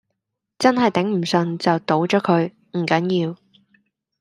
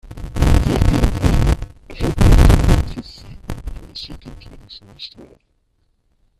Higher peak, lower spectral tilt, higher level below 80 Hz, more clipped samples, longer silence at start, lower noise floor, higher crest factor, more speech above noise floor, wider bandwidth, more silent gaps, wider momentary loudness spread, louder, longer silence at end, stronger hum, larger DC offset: about the same, -2 dBFS vs 0 dBFS; about the same, -6 dB/octave vs -6.5 dB/octave; second, -66 dBFS vs -20 dBFS; neither; first, 0.6 s vs 0.05 s; first, -78 dBFS vs -63 dBFS; about the same, 18 dB vs 16 dB; first, 59 dB vs 26 dB; second, 11.5 kHz vs 14 kHz; neither; second, 6 LU vs 24 LU; second, -20 LUFS vs -16 LUFS; second, 0.85 s vs 1.3 s; neither; neither